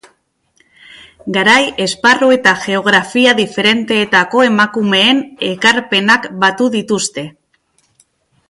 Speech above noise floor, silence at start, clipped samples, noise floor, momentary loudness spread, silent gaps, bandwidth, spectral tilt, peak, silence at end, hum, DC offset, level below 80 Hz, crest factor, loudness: 47 dB; 1.25 s; under 0.1%; -60 dBFS; 7 LU; none; 11.5 kHz; -3.5 dB/octave; 0 dBFS; 1.2 s; none; under 0.1%; -56 dBFS; 14 dB; -11 LUFS